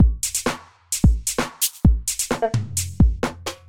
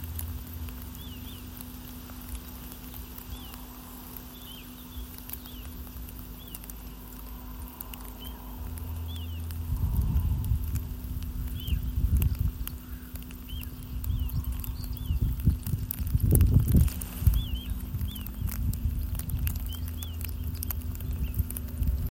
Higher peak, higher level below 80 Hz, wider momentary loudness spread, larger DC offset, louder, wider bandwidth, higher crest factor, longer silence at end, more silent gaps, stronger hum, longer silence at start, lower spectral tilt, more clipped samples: about the same, -4 dBFS vs -4 dBFS; first, -24 dBFS vs -34 dBFS; second, 8 LU vs 14 LU; first, 0.8% vs under 0.1%; first, -21 LUFS vs -33 LUFS; first, 19.5 kHz vs 17 kHz; second, 16 dB vs 28 dB; about the same, 0 s vs 0 s; neither; neither; about the same, 0 s vs 0 s; second, -4.5 dB/octave vs -6 dB/octave; neither